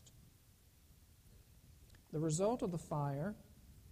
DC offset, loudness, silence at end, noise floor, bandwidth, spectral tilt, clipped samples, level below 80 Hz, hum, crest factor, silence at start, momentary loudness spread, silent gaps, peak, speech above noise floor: under 0.1%; -40 LUFS; 0 s; -66 dBFS; 15 kHz; -6.5 dB/octave; under 0.1%; -66 dBFS; none; 18 dB; 0.05 s; 26 LU; none; -24 dBFS; 28 dB